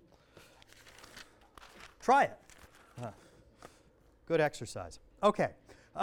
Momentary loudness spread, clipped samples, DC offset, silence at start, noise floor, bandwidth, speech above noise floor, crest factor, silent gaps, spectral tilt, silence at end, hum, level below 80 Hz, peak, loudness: 27 LU; under 0.1%; under 0.1%; 1.15 s; -64 dBFS; 17 kHz; 33 dB; 22 dB; none; -5 dB/octave; 0 s; none; -64 dBFS; -14 dBFS; -32 LUFS